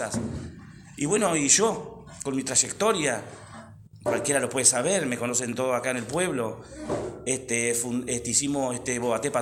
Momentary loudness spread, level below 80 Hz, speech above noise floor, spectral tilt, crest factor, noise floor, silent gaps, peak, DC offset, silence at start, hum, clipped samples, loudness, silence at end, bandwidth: 16 LU; -56 dBFS; 20 dB; -3 dB/octave; 24 dB; -46 dBFS; none; -4 dBFS; under 0.1%; 0 s; none; under 0.1%; -25 LUFS; 0 s; 16.5 kHz